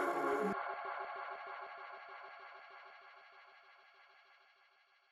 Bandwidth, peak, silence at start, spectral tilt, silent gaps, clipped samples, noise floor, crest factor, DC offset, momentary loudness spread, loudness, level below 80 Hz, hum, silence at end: 14.5 kHz; -26 dBFS; 0 s; -5.5 dB/octave; none; under 0.1%; -71 dBFS; 18 dB; under 0.1%; 26 LU; -43 LUFS; -86 dBFS; none; 0.75 s